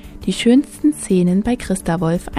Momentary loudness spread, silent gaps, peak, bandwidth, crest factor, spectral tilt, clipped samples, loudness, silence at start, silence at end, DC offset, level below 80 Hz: 6 LU; none; -2 dBFS; 15 kHz; 14 dB; -6 dB/octave; under 0.1%; -17 LUFS; 0.05 s; 0 s; under 0.1%; -38 dBFS